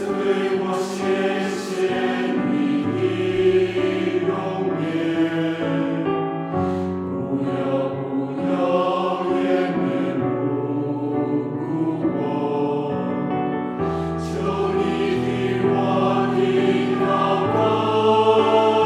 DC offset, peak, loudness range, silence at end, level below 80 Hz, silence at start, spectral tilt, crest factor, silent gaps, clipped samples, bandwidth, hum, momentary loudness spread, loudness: under 0.1%; -6 dBFS; 4 LU; 0 s; -52 dBFS; 0 s; -7 dB/octave; 16 dB; none; under 0.1%; 11.5 kHz; none; 6 LU; -21 LUFS